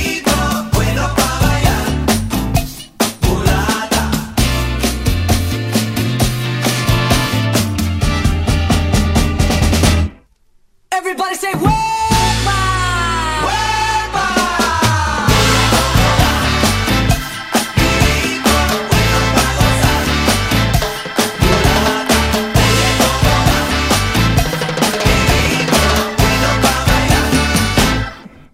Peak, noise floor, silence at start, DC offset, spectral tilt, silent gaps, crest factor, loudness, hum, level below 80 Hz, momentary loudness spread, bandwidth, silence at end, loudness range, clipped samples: 0 dBFS; -52 dBFS; 0 s; under 0.1%; -4 dB/octave; none; 14 dB; -14 LUFS; none; -22 dBFS; 5 LU; 16.5 kHz; 0.25 s; 3 LU; under 0.1%